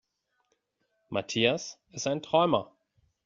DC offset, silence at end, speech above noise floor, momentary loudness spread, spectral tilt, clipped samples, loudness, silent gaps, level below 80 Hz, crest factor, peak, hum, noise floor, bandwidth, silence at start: under 0.1%; 0.6 s; 49 dB; 10 LU; -3 dB/octave; under 0.1%; -28 LUFS; none; -70 dBFS; 24 dB; -8 dBFS; none; -77 dBFS; 7.6 kHz; 1.1 s